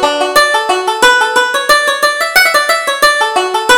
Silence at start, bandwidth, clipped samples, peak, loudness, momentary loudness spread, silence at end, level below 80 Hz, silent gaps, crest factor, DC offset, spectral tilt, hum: 0 s; over 20 kHz; 0.2%; 0 dBFS; -9 LUFS; 4 LU; 0 s; -46 dBFS; none; 10 dB; under 0.1%; 0 dB/octave; none